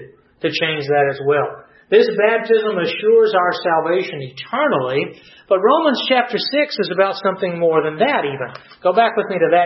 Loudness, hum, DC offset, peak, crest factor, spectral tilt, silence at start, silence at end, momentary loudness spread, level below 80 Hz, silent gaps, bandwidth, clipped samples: -17 LUFS; none; under 0.1%; -2 dBFS; 16 dB; -6.5 dB/octave; 0 s; 0 s; 8 LU; -68 dBFS; none; 6 kHz; under 0.1%